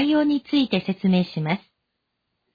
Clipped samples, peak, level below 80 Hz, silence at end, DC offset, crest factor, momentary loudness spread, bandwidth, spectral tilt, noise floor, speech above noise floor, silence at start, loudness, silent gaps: under 0.1%; -8 dBFS; -60 dBFS; 0.95 s; under 0.1%; 14 dB; 6 LU; 5 kHz; -8.5 dB/octave; -77 dBFS; 56 dB; 0 s; -22 LUFS; none